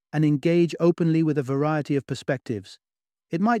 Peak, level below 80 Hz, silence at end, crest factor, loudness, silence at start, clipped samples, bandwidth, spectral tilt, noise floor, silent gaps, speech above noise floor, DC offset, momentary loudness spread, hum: -8 dBFS; -68 dBFS; 0 s; 16 dB; -24 LUFS; 0.15 s; under 0.1%; 10 kHz; -8 dB/octave; -74 dBFS; none; 51 dB; under 0.1%; 9 LU; none